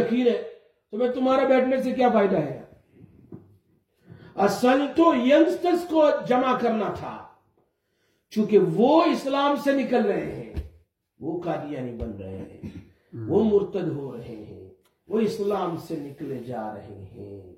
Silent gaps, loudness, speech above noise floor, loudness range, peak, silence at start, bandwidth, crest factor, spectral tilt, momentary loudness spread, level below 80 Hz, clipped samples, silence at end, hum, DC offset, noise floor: none; -23 LUFS; 48 dB; 9 LU; -6 dBFS; 0 s; 16.5 kHz; 20 dB; -6.5 dB/octave; 20 LU; -52 dBFS; under 0.1%; 0.05 s; none; under 0.1%; -71 dBFS